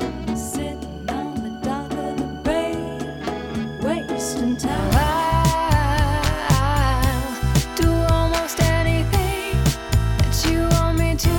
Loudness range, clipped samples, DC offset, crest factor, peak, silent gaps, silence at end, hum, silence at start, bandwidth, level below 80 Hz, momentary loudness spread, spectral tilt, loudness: 6 LU; under 0.1%; under 0.1%; 16 dB; -4 dBFS; none; 0 s; none; 0 s; 19 kHz; -26 dBFS; 9 LU; -5.5 dB/octave; -21 LUFS